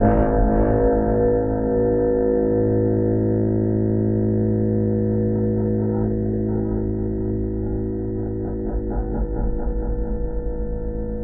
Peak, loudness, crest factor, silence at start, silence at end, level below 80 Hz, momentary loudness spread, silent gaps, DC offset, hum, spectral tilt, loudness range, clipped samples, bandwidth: -4 dBFS; -22 LUFS; 16 dB; 0 s; 0 s; -28 dBFS; 8 LU; none; under 0.1%; none; -15 dB/octave; 7 LU; under 0.1%; 2.4 kHz